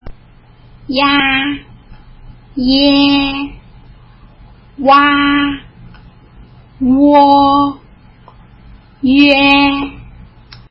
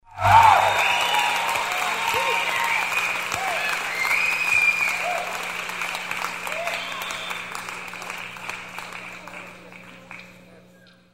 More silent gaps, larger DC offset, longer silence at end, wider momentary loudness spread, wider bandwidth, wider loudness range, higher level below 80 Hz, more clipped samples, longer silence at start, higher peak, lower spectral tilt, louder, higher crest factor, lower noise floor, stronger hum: neither; second, under 0.1% vs 0.2%; second, 0.15 s vs 0.55 s; second, 16 LU vs 20 LU; second, 5.8 kHz vs 16 kHz; second, 4 LU vs 14 LU; first, -38 dBFS vs -56 dBFS; neither; about the same, 0.05 s vs 0.1 s; about the same, 0 dBFS vs -2 dBFS; first, -6.5 dB/octave vs -1.5 dB/octave; first, -10 LUFS vs -21 LUFS; second, 14 dB vs 22 dB; second, -42 dBFS vs -52 dBFS; neither